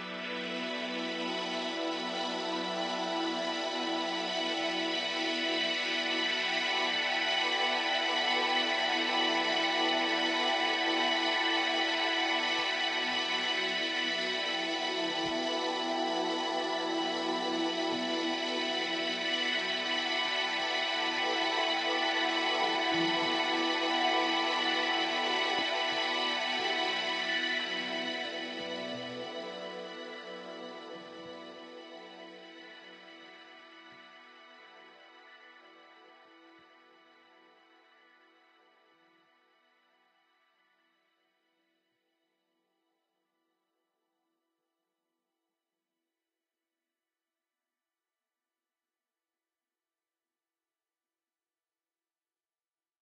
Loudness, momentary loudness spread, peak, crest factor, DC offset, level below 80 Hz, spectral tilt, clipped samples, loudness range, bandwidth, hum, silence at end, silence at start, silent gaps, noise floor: -30 LUFS; 15 LU; -16 dBFS; 20 dB; under 0.1%; -80 dBFS; -2 dB/octave; under 0.1%; 15 LU; 9.6 kHz; none; 16.5 s; 0 s; none; under -90 dBFS